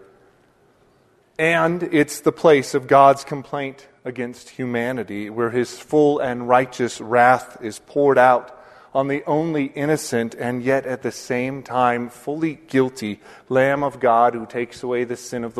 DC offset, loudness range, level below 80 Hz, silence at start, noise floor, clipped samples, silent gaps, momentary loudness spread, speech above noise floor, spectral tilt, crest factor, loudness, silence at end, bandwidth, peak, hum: under 0.1%; 5 LU; -62 dBFS; 1.4 s; -58 dBFS; under 0.1%; none; 14 LU; 38 dB; -5.5 dB/octave; 20 dB; -20 LUFS; 0 s; 13.5 kHz; 0 dBFS; none